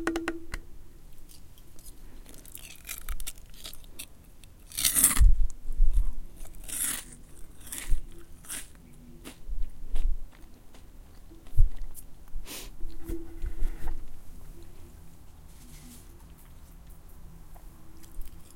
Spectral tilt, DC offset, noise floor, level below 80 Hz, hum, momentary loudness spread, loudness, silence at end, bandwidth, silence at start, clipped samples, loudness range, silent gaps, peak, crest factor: -2.5 dB/octave; under 0.1%; -49 dBFS; -32 dBFS; none; 23 LU; -32 LUFS; 0.15 s; 17 kHz; 0 s; under 0.1%; 23 LU; none; -2 dBFS; 26 dB